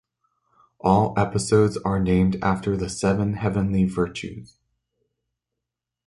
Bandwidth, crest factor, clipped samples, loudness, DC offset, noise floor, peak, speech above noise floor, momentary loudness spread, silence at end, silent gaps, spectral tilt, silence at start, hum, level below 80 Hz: 11.5 kHz; 20 dB; under 0.1%; -22 LUFS; under 0.1%; -85 dBFS; -4 dBFS; 63 dB; 8 LU; 1.6 s; none; -6.5 dB/octave; 0.85 s; 60 Hz at -55 dBFS; -42 dBFS